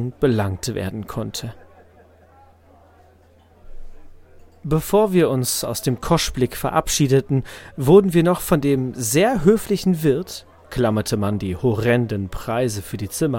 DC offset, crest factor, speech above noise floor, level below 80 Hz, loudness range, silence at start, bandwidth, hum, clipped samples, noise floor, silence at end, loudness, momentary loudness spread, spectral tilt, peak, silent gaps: under 0.1%; 20 dB; 33 dB; -40 dBFS; 14 LU; 0 s; 17 kHz; none; under 0.1%; -52 dBFS; 0 s; -20 LUFS; 12 LU; -5.5 dB/octave; 0 dBFS; none